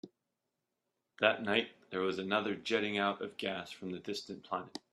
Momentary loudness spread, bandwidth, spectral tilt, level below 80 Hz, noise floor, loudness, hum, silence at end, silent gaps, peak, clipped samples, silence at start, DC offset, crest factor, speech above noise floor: 10 LU; 13 kHz; -4.5 dB/octave; -78 dBFS; -87 dBFS; -35 LUFS; none; 0.15 s; none; -12 dBFS; under 0.1%; 0.05 s; under 0.1%; 26 dB; 51 dB